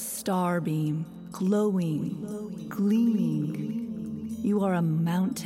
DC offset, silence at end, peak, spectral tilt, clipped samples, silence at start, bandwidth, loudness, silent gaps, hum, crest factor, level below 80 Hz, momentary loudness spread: under 0.1%; 0 s; -16 dBFS; -7 dB/octave; under 0.1%; 0 s; 16.5 kHz; -28 LUFS; none; none; 12 dB; -66 dBFS; 11 LU